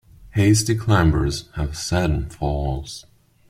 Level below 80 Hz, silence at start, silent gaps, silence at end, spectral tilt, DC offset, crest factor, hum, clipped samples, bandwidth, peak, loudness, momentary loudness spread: -32 dBFS; 0.2 s; none; 0.5 s; -5.5 dB/octave; under 0.1%; 18 dB; none; under 0.1%; 15.5 kHz; -2 dBFS; -21 LUFS; 11 LU